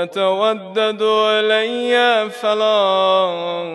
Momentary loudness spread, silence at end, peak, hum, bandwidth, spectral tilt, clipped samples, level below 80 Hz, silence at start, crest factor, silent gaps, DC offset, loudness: 5 LU; 0 s; -4 dBFS; none; 12 kHz; -3.5 dB/octave; under 0.1%; -76 dBFS; 0 s; 12 dB; none; under 0.1%; -16 LUFS